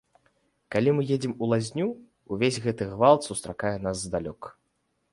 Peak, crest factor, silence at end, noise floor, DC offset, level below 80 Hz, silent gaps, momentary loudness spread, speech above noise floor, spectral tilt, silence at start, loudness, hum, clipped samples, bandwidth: -6 dBFS; 22 dB; 0.6 s; -74 dBFS; under 0.1%; -56 dBFS; none; 16 LU; 49 dB; -5.5 dB/octave; 0.7 s; -26 LUFS; none; under 0.1%; 11.5 kHz